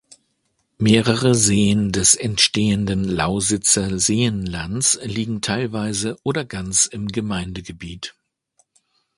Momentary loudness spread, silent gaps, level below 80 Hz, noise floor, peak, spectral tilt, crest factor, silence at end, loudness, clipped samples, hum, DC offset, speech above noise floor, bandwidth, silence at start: 11 LU; none; -44 dBFS; -69 dBFS; 0 dBFS; -3.5 dB/octave; 20 dB; 1.05 s; -18 LUFS; under 0.1%; none; under 0.1%; 50 dB; 11.5 kHz; 0.8 s